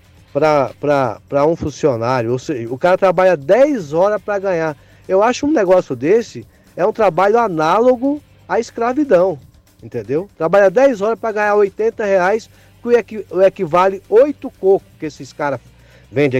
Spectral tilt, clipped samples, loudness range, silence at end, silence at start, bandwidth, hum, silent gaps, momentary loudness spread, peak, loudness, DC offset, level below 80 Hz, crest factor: -6.5 dB/octave; under 0.1%; 2 LU; 0 s; 0.35 s; 9.6 kHz; none; none; 11 LU; -4 dBFS; -15 LUFS; under 0.1%; -50 dBFS; 12 dB